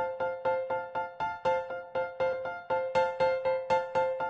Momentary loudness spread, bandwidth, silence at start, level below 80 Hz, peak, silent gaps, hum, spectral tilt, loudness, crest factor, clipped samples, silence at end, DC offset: 7 LU; 8 kHz; 0 s; -64 dBFS; -16 dBFS; none; none; -5 dB/octave; -31 LUFS; 16 dB; under 0.1%; 0 s; under 0.1%